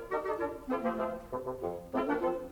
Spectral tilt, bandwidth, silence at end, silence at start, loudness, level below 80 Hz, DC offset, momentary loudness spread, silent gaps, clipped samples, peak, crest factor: -7 dB/octave; over 20 kHz; 0 s; 0 s; -35 LUFS; -58 dBFS; under 0.1%; 7 LU; none; under 0.1%; -18 dBFS; 16 dB